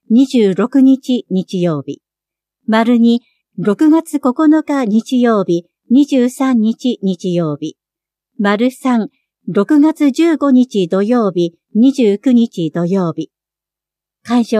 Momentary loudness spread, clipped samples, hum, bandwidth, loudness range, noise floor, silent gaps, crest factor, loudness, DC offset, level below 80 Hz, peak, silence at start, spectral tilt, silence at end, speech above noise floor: 9 LU; under 0.1%; none; 13 kHz; 3 LU; -86 dBFS; none; 14 dB; -14 LUFS; under 0.1%; -70 dBFS; 0 dBFS; 0.1 s; -7 dB/octave; 0 s; 74 dB